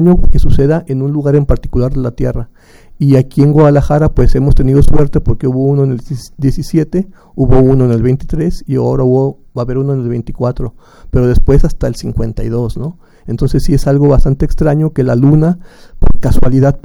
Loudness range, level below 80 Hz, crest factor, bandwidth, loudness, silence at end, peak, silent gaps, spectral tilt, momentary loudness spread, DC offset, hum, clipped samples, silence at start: 4 LU; -16 dBFS; 10 dB; 11.5 kHz; -12 LUFS; 0.05 s; 0 dBFS; none; -9 dB/octave; 9 LU; under 0.1%; none; 0.4%; 0 s